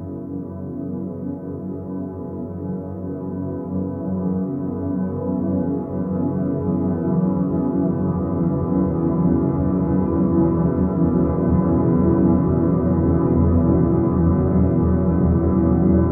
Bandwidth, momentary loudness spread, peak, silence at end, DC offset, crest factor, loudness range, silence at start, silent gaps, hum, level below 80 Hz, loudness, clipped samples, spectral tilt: 2.3 kHz; 12 LU; -6 dBFS; 0 s; under 0.1%; 14 dB; 10 LU; 0 s; none; none; -34 dBFS; -20 LUFS; under 0.1%; -14.5 dB/octave